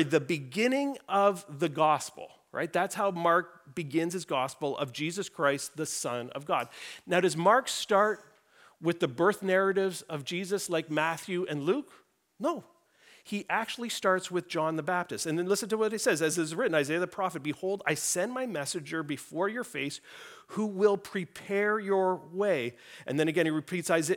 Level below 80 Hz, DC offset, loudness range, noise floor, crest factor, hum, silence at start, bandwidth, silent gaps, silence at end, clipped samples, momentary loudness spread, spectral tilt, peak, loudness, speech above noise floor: -78 dBFS; under 0.1%; 4 LU; -61 dBFS; 20 dB; none; 0 s; 18.5 kHz; none; 0 s; under 0.1%; 10 LU; -4 dB/octave; -10 dBFS; -30 LUFS; 31 dB